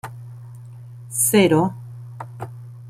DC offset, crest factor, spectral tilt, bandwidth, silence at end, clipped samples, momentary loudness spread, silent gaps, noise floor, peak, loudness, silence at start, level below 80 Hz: under 0.1%; 20 dB; -4.5 dB/octave; 16 kHz; 0 s; under 0.1%; 24 LU; none; -38 dBFS; -4 dBFS; -18 LUFS; 0.05 s; -58 dBFS